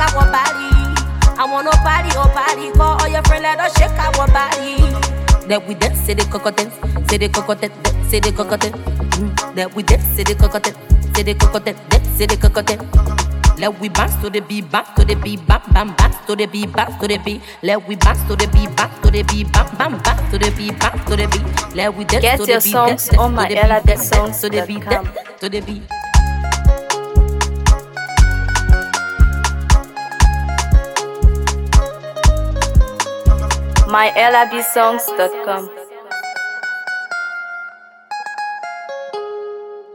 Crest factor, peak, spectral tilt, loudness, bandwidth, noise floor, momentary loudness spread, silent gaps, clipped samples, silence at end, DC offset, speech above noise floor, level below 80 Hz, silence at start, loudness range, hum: 14 dB; 0 dBFS; -4.5 dB/octave; -16 LUFS; 18.5 kHz; -36 dBFS; 10 LU; none; under 0.1%; 0 s; under 0.1%; 21 dB; -16 dBFS; 0 s; 4 LU; none